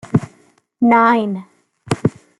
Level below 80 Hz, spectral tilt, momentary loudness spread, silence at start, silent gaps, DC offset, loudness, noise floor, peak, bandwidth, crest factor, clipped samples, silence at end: -52 dBFS; -7 dB/octave; 15 LU; 0.15 s; none; under 0.1%; -16 LUFS; -54 dBFS; 0 dBFS; 11.5 kHz; 16 dB; under 0.1%; 0.3 s